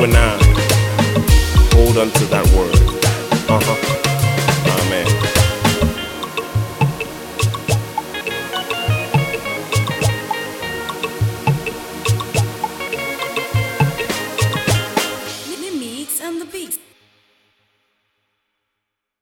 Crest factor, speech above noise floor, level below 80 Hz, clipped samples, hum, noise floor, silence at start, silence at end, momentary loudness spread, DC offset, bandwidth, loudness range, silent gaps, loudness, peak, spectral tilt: 16 dB; 66 dB; -22 dBFS; under 0.1%; none; -78 dBFS; 0 s; 2.45 s; 11 LU; under 0.1%; 18 kHz; 9 LU; none; -17 LUFS; 0 dBFS; -4.5 dB/octave